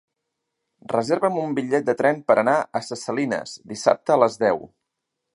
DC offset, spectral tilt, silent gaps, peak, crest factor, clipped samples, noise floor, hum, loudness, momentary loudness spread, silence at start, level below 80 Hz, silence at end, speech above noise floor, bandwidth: under 0.1%; -5 dB/octave; none; -2 dBFS; 20 dB; under 0.1%; -81 dBFS; none; -22 LUFS; 10 LU; 0.9 s; -68 dBFS; 0.7 s; 59 dB; 11.5 kHz